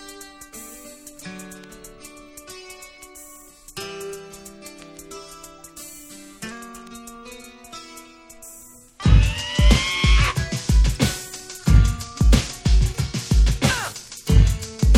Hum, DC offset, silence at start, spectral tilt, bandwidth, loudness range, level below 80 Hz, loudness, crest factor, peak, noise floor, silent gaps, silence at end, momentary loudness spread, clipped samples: none; under 0.1%; 0 s; -4.5 dB/octave; 15.5 kHz; 19 LU; -24 dBFS; -20 LUFS; 20 dB; -2 dBFS; -45 dBFS; none; 0 s; 23 LU; under 0.1%